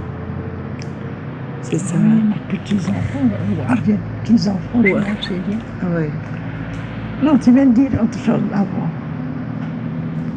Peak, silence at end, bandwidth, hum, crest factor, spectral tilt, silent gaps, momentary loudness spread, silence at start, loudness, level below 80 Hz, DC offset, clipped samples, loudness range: -2 dBFS; 0 s; 9.4 kHz; none; 16 dB; -7.5 dB/octave; none; 13 LU; 0 s; -19 LUFS; -42 dBFS; under 0.1%; under 0.1%; 3 LU